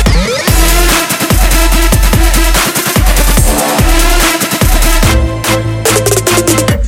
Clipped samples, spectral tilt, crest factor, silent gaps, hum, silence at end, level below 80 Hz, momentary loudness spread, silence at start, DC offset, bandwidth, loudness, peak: 0.2%; -3.5 dB/octave; 8 dB; none; none; 0 s; -12 dBFS; 2 LU; 0 s; under 0.1%; 17 kHz; -9 LUFS; 0 dBFS